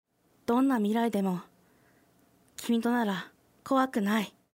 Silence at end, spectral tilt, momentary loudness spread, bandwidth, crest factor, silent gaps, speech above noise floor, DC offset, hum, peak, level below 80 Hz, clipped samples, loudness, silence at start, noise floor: 0.3 s; -6 dB/octave; 13 LU; 16 kHz; 16 dB; none; 37 dB; under 0.1%; none; -14 dBFS; -74 dBFS; under 0.1%; -29 LUFS; 0.5 s; -65 dBFS